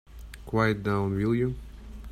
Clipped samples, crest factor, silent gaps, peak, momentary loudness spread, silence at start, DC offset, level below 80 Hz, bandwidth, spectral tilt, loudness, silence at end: under 0.1%; 18 dB; none; -10 dBFS; 20 LU; 0.1 s; under 0.1%; -44 dBFS; 14 kHz; -8 dB/octave; -27 LUFS; 0 s